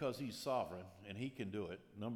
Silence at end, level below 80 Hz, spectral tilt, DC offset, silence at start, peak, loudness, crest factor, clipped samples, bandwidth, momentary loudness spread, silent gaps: 0 s; -78 dBFS; -5.5 dB/octave; under 0.1%; 0 s; -28 dBFS; -45 LUFS; 16 dB; under 0.1%; 19.5 kHz; 9 LU; none